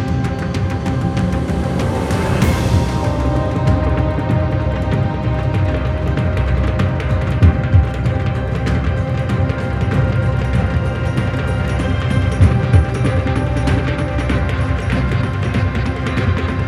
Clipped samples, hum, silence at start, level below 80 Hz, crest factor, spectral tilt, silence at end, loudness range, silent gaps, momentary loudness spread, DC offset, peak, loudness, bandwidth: under 0.1%; none; 0 s; -24 dBFS; 16 dB; -7.5 dB/octave; 0 s; 1 LU; none; 5 LU; under 0.1%; 0 dBFS; -17 LUFS; 12.5 kHz